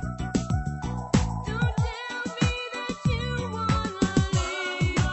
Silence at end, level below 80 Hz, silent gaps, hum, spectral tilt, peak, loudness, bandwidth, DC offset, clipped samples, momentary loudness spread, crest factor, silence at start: 0 s; -36 dBFS; none; none; -5.5 dB/octave; -8 dBFS; -27 LUFS; 8.4 kHz; under 0.1%; under 0.1%; 6 LU; 18 dB; 0 s